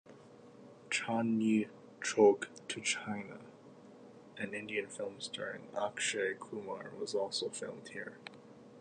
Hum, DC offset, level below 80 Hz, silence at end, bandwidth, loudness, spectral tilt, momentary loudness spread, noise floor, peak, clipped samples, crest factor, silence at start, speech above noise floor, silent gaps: none; under 0.1%; -82 dBFS; 0 s; 10 kHz; -36 LUFS; -3.5 dB/octave; 25 LU; -57 dBFS; -14 dBFS; under 0.1%; 24 dB; 0.05 s; 21 dB; none